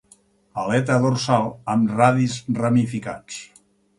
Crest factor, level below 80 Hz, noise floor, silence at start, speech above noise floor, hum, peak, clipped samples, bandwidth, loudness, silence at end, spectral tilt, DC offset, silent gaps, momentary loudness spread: 20 dB; -58 dBFS; -56 dBFS; 0.55 s; 36 dB; none; -2 dBFS; under 0.1%; 11.5 kHz; -21 LUFS; 0.55 s; -6.5 dB/octave; under 0.1%; none; 16 LU